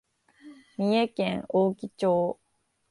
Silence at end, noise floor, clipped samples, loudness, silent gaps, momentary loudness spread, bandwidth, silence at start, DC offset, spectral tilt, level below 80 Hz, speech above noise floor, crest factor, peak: 0.55 s; -73 dBFS; under 0.1%; -27 LUFS; none; 8 LU; 11.5 kHz; 0.45 s; under 0.1%; -7 dB/octave; -66 dBFS; 48 dB; 16 dB; -12 dBFS